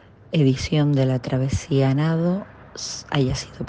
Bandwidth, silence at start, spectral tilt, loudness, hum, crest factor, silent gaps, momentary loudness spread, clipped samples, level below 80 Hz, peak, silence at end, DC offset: 9.2 kHz; 0.3 s; -6.5 dB/octave; -22 LUFS; none; 16 dB; none; 11 LU; under 0.1%; -42 dBFS; -6 dBFS; 0 s; under 0.1%